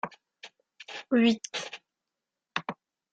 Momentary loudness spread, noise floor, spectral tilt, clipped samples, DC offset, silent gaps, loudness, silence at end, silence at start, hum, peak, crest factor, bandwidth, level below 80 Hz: 26 LU; -88 dBFS; -4 dB/octave; under 0.1%; under 0.1%; none; -29 LUFS; 0.4 s; 0.05 s; none; -12 dBFS; 20 dB; 9 kHz; -76 dBFS